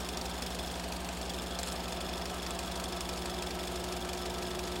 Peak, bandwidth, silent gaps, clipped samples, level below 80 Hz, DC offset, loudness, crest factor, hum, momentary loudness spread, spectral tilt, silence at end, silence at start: -20 dBFS; 17 kHz; none; under 0.1%; -46 dBFS; under 0.1%; -37 LUFS; 16 dB; 60 Hz at -45 dBFS; 1 LU; -3.5 dB/octave; 0 s; 0 s